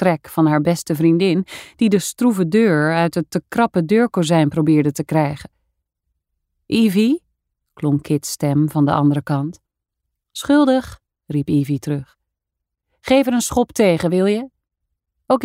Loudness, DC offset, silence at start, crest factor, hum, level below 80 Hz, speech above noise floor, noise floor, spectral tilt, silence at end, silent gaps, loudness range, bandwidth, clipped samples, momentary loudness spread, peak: -18 LUFS; under 0.1%; 0 s; 16 dB; none; -52 dBFS; 65 dB; -81 dBFS; -6 dB/octave; 0 s; none; 4 LU; 16 kHz; under 0.1%; 9 LU; -2 dBFS